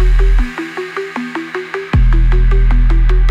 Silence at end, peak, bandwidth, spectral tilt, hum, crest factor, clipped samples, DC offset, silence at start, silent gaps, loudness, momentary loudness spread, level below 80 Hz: 0 s; -4 dBFS; 5.4 kHz; -7.5 dB/octave; none; 8 dB; under 0.1%; under 0.1%; 0 s; none; -16 LUFS; 9 LU; -12 dBFS